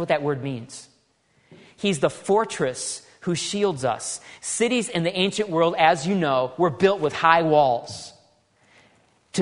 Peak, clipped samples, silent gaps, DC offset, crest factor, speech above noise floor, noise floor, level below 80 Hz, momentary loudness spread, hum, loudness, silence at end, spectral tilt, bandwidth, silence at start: -2 dBFS; under 0.1%; none; under 0.1%; 22 dB; 42 dB; -64 dBFS; -64 dBFS; 13 LU; none; -22 LUFS; 0 s; -4 dB/octave; 11 kHz; 0 s